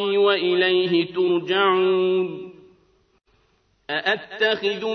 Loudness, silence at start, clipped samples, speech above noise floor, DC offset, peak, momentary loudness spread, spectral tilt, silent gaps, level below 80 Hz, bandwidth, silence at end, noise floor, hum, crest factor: -21 LUFS; 0 s; under 0.1%; 43 dB; under 0.1%; -6 dBFS; 8 LU; -6 dB/octave; none; -70 dBFS; 6.2 kHz; 0 s; -64 dBFS; none; 16 dB